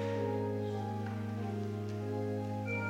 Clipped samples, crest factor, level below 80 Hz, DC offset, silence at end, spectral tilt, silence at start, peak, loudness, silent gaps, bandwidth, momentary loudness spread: under 0.1%; 12 dB; -72 dBFS; under 0.1%; 0 s; -8 dB/octave; 0 s; -24 dBFS; -37 LUFS; none; 10 kHz; 4 LU